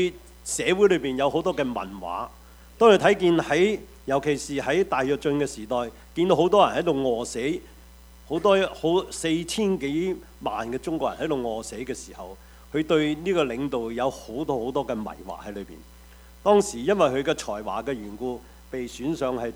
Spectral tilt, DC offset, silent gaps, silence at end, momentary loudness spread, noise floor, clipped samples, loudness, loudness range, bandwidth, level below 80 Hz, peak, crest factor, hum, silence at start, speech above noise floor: -5 dB/octave; under 0.1%; none; 0 s; 14 LU; -48 dBFS; under 0.1%; -25 LUFS; 6 LU; over 20 kHz; -50 dBFS; -4 dBFS; 22 dB; none; 0 s; 24 dB